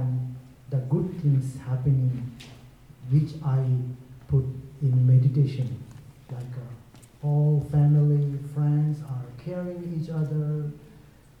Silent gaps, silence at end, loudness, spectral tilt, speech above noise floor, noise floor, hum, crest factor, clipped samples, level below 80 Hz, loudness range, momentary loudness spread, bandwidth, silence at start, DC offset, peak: none; 0.4 s; -26 LUFS; -10 dB/octave; 28 dB; -51 dBFS; none; 14 dB; under 0.1%; -54 dBFS; 3 LU; 19 LU; 5.4 kHz; 0 s; under 0.1%; -10 dBFS